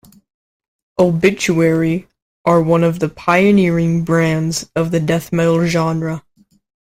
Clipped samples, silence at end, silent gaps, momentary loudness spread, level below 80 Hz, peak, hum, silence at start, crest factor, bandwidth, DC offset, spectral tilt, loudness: under 0.1%; 0.7 s; 2.22-2.44 s; 8 LU; -48 dBFS; 0 dBFS; none; 1 s; 16 dB; 15.5 kHz; under 0.1%; -6.5 dB/octave; -15 LUFS